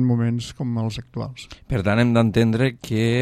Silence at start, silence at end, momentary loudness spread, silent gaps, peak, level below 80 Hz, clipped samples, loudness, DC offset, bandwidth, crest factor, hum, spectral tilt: 0 s; 0 s; 14 LU; none; -2 dBFS; -44 dBFS; under 0.1%; -22 LUFS; under 0.1%; 12.5 kHz; 18 dB; none; -7 dB/octave